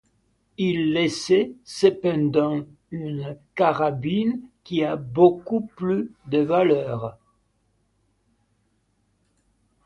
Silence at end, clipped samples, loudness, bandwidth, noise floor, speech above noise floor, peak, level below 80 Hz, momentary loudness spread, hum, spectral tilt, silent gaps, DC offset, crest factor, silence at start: 2.75 s; under 0.1%; -23 LUFS; 11.5 kHz; -68 dBFS; 46 dB; -4 dBFS; -62 dBFS; 13 LU; none; -6.5 dB/octave; none; under 0.1%; 20 dB; 0.6 s